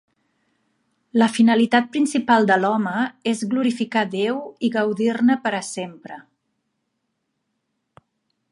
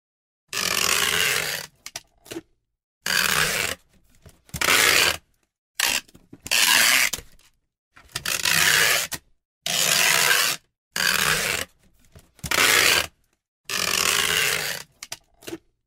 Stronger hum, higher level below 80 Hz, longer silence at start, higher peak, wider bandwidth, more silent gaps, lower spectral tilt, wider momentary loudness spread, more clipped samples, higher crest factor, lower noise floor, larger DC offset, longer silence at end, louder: neither; second, -74 dBFS vs -52 dBFS; first, 1.15 s vs 0.55 s; about the same, -2 dBFS vs -2 dBFS; second, 11.5 kHz vs 16.5 kHz; second, none vs 2.84-3.01 s, 5.58-5.75 s, 7.78-7.91 s, 9.45-9.61 s, 10.78-10.91 s, 13.48-13.64 s; first, -5 dB/octave vs 0 dB/octave; second, 13 LU vs 22 LU; neither; about the same, 20 dB vs 22 dB; first, -75 dBFS vs -57 dBFS; neither; first, 2.3 s vs 0.3 s; about the same, -20 LUFS vs -19 LUFS